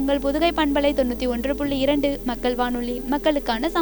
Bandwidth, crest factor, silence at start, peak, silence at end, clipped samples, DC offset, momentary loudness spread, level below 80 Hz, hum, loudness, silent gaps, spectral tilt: over 20 kHz; 16 dB; 0 s; -6 dBFS; 0 s; under 0.1%; under 0.1%; 4 LU; -38 dBFS; none; -22 LUFS; none; -5.5 dB/octave